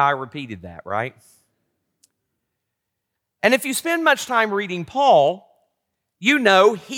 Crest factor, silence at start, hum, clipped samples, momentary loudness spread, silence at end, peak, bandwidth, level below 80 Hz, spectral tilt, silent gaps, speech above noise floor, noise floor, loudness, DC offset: 18 dB; 0 s; none; under 0.1%; 17 LU; 0 s; -2 dBFS; 18 kHz; -68 dBFS; -3.5 dB/octave; none; 61 dB; -80 dBFS; -18 LUFS; under 0.1%